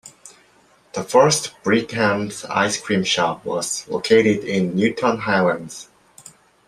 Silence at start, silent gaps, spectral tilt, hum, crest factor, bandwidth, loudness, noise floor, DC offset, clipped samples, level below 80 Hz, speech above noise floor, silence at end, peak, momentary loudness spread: 0.05 s; none; -4 dB/octave; none; 18 dB; 14.5 kHz; -19 LUFS; -55 dBFS; under 0.1%; under 0.1%; -60 dBFS; 36 dB; 0.85 s; -2 dBFS; 9 LU